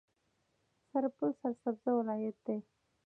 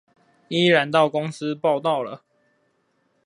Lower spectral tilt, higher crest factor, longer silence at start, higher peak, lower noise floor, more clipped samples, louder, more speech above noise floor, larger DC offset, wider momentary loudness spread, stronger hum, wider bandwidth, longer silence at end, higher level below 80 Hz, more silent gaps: first, -10 dB/octave vs -5.5 dB/octave; about the same, 16 dB vs 20 dB; first, 0.95 s vs 0.5 s; second, -22 dBFS vs -2 dBFS; first, -79 dBFS vs -68 dBFS; neither; second, -37 LUFS vs -21 LUFS; second, 43 dB vs 47 dB; neither; second, 7 LU vs 11 LU; neither; second, 2.9 kHz vs 11 kHz; second, 0.45 s vs 1.1 s; second, -88 dBFS vs -74 dBFS; neither